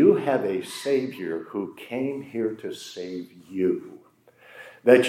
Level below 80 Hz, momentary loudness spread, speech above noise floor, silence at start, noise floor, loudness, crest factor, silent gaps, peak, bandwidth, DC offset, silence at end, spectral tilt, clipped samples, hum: -78 dBFS; 13 LU; 27 dB; 0 s; -56 dBFS; -27 LUFS; 22 dB; none; -2 dBFS; 15.5 kHz; under 0.1%; 0 s; -5.5 dB/octave; under 0.1%; none